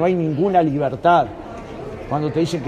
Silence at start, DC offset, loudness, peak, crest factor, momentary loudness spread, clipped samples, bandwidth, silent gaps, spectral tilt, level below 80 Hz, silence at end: 0 s; under 0.1%; -19 LUFS; -4 dBFS; 16 dB; 16 LU; under 0.1%; 10.5 kHz; none; -7.5 dB/octave; -46 dBFS; 0 s